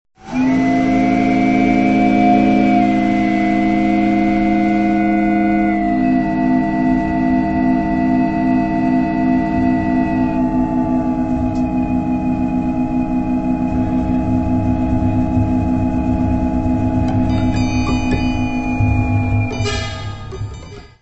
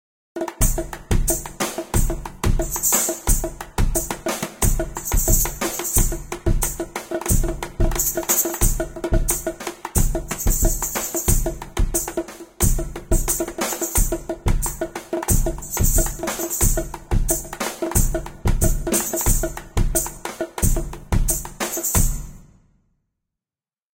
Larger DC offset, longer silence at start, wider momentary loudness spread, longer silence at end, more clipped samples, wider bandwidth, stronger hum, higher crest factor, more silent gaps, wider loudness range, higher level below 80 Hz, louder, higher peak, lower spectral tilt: neither; about the same, 0.25 s vs 0.35 s; second, 5 LU vs 9 LU; second, 0.15 s vs 1.6 s; neither; second, 8.2 kHz vs 17 kHz; neither; about the same, 14 dB vs 18 dB; neither; about the same, 4 LU vs 2 LU; second, -30 dBFS vs -24 dBFS; first, -16 LUFS vs -22 LUFS; about the same, -2 dBFS vs -2 dBFS; first, -8 dB/octave vs -4 dB/octave